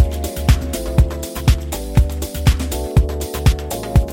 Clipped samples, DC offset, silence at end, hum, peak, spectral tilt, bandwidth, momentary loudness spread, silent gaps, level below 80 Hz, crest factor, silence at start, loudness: under 0.1%; under 0.1%; 0 s; none; 0 dBFS; -6 dB/octave; 17 kHz; 4 LU; none; -20 dBFS; 16 dB; 0 s; -19 LUFS